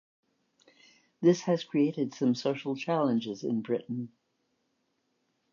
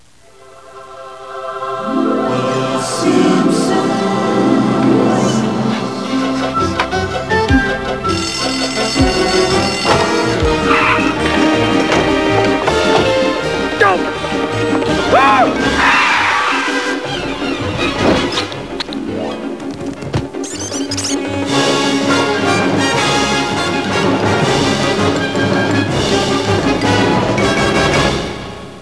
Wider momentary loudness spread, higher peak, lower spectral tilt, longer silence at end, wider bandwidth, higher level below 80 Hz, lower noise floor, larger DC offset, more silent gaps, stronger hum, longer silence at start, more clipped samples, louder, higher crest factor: about the same, 7 LU vs 9 LU; second, -12 dBFS vs 0 dBFS; first, -6.5 dB/octave vs -4.5 dB/octave; first, 1.45 s vs 0 s; second, 7.2 kHz vs 11 kHz; second, -84 dBFS vs -34 dBFS; first, -77 dBFS vs -44 dBFS; second, under 0.1% vs 0.6%; neither; neither; first, 1.2 s vs 0.5 s; neither; second, -30 LUFS vs -14 LUFS; first, 20 dB vs 14 dB